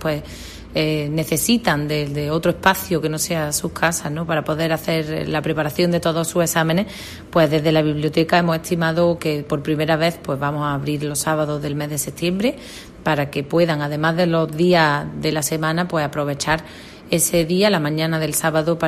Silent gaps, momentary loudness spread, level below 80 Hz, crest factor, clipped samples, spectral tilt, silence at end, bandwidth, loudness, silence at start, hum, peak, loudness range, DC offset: none; 6 LU; -46 dBFS; 18 dB; under 0.1%; -4.5 dB/octave; 0 s; 15.5 kHz; -20 LUFS; 0 s; none; -2 dBFS; 3 LU; under 0.1%